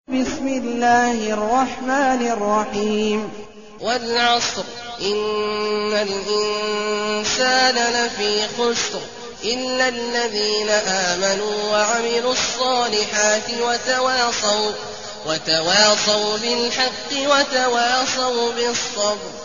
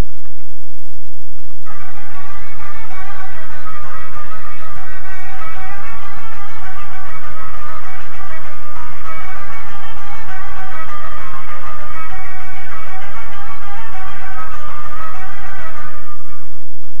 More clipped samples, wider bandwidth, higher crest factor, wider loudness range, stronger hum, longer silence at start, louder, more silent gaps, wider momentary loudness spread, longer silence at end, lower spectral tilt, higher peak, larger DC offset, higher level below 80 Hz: neither; second, 7.6 kHz vs 16 kHz; about the same, 18 dB vs 16 dB; about the same, 3 LU vs 3 LU; neither; about the same, 0.05 s vs 0 s; first, -19 LUFS vs -32 LUFS; neither; second, 7 LU vs 12 LU; about the same, 0 s vs 0 s; second, -0.5 dB/octave vs -5.5 dB/octave; about the same, -2 dBFS vs 0 dBFS; second, 0.5% vs 80%; second, -52 dBFS vs -42 dBFS